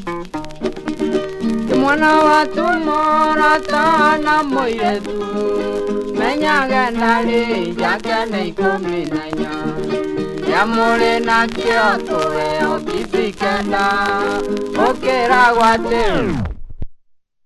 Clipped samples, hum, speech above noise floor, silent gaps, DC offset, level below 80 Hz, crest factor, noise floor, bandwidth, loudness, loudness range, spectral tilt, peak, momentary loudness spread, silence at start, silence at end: under 0.1%; none; 37 dB; none; under 0.1%; -38 dBFS; 16 dB; -53 dBFS; 12.5 kHz; -16 LUFS; 4 LU; -5 dB/octave; 0 dBFS; 10 LU; 0 s; 0.5 s